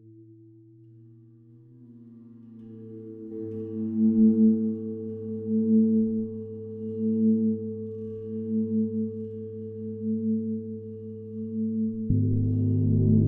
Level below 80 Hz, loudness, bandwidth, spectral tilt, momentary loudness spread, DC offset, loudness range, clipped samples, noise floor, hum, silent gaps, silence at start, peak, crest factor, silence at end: -50 dBFS; -27 LUFS; 1.2 kHz; -15 dB/octave; 17 LU; under 0.1%; 9 LU; under 0.1%; -52 dBFS; none; none; 0.05 s; -10 dBFS; 16 dB; 0 s